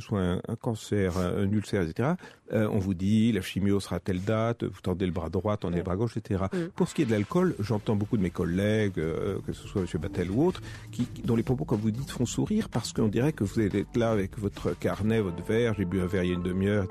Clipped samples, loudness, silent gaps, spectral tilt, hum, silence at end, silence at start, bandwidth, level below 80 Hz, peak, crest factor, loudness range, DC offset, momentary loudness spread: under 0.1%; -29 LUFS; none; -7 dB/octave; none; 0 s; 0 s; 13.5 kHz; -50 dBFS; -14 dBFS; 14 dB; 2 LU; under 0.1%; 6 LU